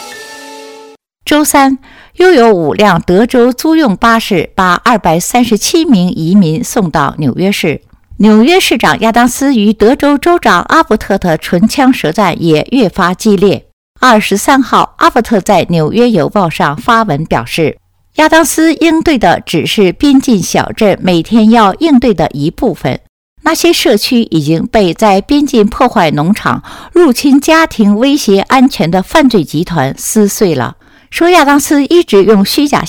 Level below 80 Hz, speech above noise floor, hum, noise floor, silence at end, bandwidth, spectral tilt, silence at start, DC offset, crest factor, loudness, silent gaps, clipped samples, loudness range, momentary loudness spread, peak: -36 dBFS; 28 dB; none; -36 dBFS; 0 s; 19 kHz; -5 dB/octave; 0 s; 0.3%; 8 dB; -9 LUFS; 13.73-13.94 s, 23.09-23.36 s; 1%; 2 LU; 7 LU; 0 dBFS